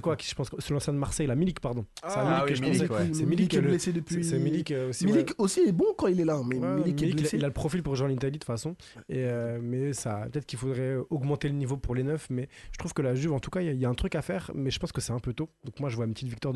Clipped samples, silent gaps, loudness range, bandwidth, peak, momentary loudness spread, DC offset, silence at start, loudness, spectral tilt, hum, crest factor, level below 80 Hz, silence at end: under 0.1%; none; 5 LU; 12.5 kHz; -14 dBFS; 9 LU; under 0.1%; 0 s; -29 LUFS; -6 dB/octave; none; 16 dB; -48 dBFS; 0 s